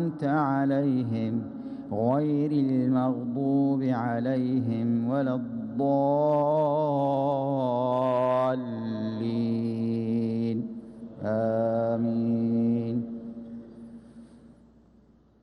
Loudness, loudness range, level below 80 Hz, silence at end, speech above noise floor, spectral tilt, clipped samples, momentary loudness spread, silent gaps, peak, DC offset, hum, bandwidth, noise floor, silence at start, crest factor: -27 LUFS; 4 LU; -66 dBFS; 0.95 s; 33 dB; -10 dB/octave; under 0.1%; 12 LU; none; -12 dBFS; under 0.1%; none; 5.8 kHz; -59 dBFS; 0 s; 14 dB